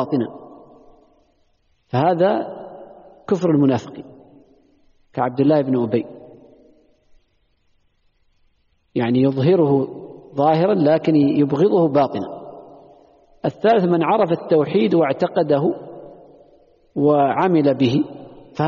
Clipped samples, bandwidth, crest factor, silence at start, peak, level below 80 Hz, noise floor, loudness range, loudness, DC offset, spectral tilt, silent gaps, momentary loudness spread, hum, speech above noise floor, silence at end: under 0.1%; 7 kHz; 14 dB; 0 s; -6 dBFS; -62 dBFS; -63 dBFS; 6 LU; -18 LUFS; under 0.1%; -7 dB/octave; none; 18 LU; none; 46 dB; 0 s